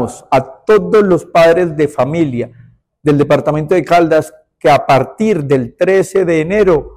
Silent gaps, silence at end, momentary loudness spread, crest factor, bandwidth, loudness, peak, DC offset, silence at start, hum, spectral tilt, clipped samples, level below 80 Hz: none; 0.05 s; 6 LU; 10 dB; 15 kHz; -12 LUFS; -2 dBFS; under 0.1%; 0 s; none; -6.5 dB/octave; under 0.1%; -42 dBFS